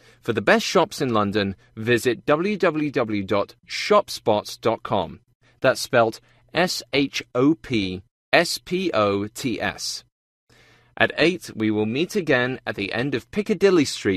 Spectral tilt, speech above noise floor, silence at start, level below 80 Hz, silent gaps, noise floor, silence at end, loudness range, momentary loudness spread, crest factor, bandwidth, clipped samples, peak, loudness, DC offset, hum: -4.5 dB/octave; 33 dB; 0.25 s; -56 dBFS; 5.35-5.40 s, 8.11-8.32 s, 10.12-10.47 s; -55 dBFS; 0 s; 2 LU; 9 LU; 22 dB; 14 kHz; under 0.1%; 0 dBFS; -22 LUFS; under 0.1%; none